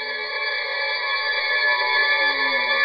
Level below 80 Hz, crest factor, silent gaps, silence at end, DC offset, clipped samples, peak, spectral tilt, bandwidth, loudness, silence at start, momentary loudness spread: -70 dBFS; 14 dB; none; 0 s; under 0.1%; under 0.1%; -8 dBFS; -2 dB/octave; 5.8 kHz; -20 LUFS; 0 s; 6 LU